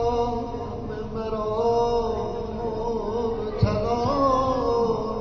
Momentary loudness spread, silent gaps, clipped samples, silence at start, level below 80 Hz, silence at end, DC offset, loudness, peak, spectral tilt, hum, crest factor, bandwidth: 9 LU; none; under 0.1%; 0 s; -38 dBFS; 0 s; 0.1%; -25 LUFS; -8 dBFS; -6.5 dB/octave; none; 16 dB; 6.8 kHz